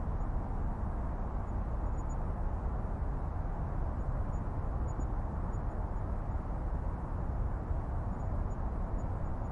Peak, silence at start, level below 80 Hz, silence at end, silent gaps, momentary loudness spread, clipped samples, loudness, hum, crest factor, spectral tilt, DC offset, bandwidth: -22 dBFS; 0 s; -36 dBFS; 0 s; none; 1 LU; under 0.1%; -38 LUFS; none; 12 dB; -9.5 dB/octave; under 0.1%; 7.4 kHz